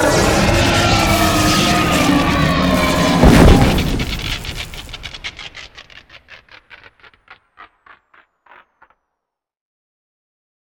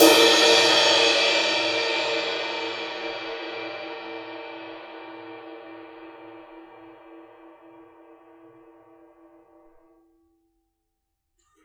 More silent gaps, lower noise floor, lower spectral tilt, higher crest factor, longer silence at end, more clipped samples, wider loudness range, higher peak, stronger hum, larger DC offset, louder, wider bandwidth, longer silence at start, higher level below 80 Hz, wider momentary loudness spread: neither; about the same, -79 dBFS vs -78 dBFS; first, -4.5 dB/octave vs -1 dB/octave; second, 16 dB vs 26 dB; second, 2.95 s vs 4.45 s; neither; second, 21 LU vs 26 LU; about the same, 0 dBFS vs 0 dBFS; neither; neither; first, -13 LUFS vs -20 LUFS; about the same, 19.5 kHz vs 19.5 kHz; about the same, 0 s vs 0 s; first, -24 dBFS vs -70 dBFS; second, 19 LU vs 26 LU